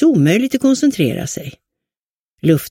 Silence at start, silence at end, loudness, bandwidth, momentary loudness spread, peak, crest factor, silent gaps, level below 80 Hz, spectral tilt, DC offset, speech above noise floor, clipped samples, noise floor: 0 s; 0 s; -16 LUFS; 16.5 kHz; 13 LU; -2 dBFS; 14 dB; 1.99-2.36 s; -52 dBFS; -6 dB/octave; under 0.1%; over 76 dB; under 0.1%; under -90 dBFS